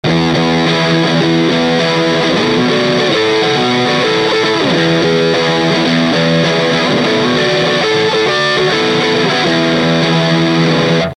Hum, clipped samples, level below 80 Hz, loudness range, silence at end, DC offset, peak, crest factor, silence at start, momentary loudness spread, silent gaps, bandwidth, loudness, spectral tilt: none; under 0.1%; -44 dBFS; 0 LU; 0.05 s; under 0.1%; 0 dBFS; 12 dB; 0.05 s; 1 LU; none; 10.5 kHz; -11 LUFS; -5 dB/octave